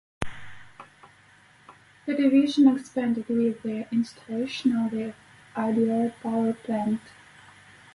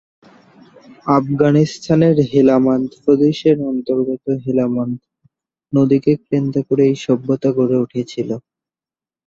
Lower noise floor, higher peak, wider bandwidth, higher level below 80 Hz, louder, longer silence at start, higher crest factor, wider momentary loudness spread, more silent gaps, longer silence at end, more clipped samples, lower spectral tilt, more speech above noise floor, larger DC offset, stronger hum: second, -56 dBFS vs under -90 dBFS; second, -8 dBFS vs 0 dBFS; first, 11.5 kHz vs 7.6 kHz; about the same, -58 dBFS vs -54 dBFS; second, -26 LUFS vs -16 LUFS; second, 0.2 s vs 1.05 s; about the same, 18 dB vs 16 dB; first, 16 LU vs 10 LU; neither; about the same, 0.85 s vs 0.85 s; neither; second, -6.5 dB/octave vs -8 dB/octave; second, 32 dB vs over 75 dB; neither; neither